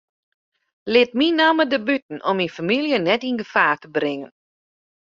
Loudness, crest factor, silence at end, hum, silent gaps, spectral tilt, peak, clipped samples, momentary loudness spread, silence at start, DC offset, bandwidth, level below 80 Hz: -20 LUFS; 20 dB; 0.9 s; none; 2.02-2.09 s; -5.5 dB/octave; -2 dBFS; under 0.1%; 8 LU; 0.85 s; under 0.1%; 7.4 kHz; -66 dBFS